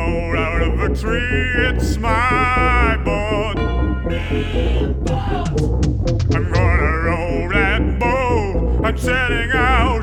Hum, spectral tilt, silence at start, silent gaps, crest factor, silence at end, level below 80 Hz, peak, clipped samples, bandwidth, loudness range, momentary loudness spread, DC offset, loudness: none; -6.5 dB/octave; 0 s; none; 16 dB; 0 s; -22 dBFS; -2 dBFS; under 0.1%; 11.5 kHz; 2 LU; 5 LU; under 0.1%; -18 LUFS